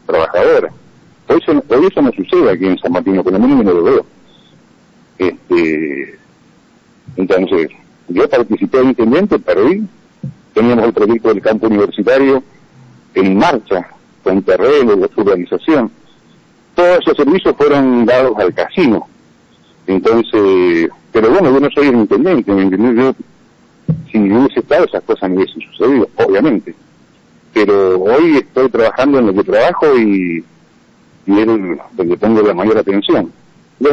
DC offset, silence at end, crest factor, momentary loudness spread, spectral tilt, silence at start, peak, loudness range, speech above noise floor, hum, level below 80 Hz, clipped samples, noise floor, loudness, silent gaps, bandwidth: 0.1%; 0 s; 8 dB; 9 LU; -7.5 dB/octave; 0.1 s; -4 dBFS; 3 LU; 37 dB; none; -46 dBFS; under 0.1%; -48 dBFS; -12 LUFS; none; 7.4 kHz